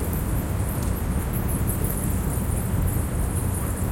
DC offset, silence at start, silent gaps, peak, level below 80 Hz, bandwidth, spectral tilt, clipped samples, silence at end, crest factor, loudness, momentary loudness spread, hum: under 0.1%; 0 s; none; -10 dBFS; -30 dBFS; 17 kHz; -6 dB/octave; under 0.1%; 0 s; 14 dB; -26 LUFS; 2 LU; none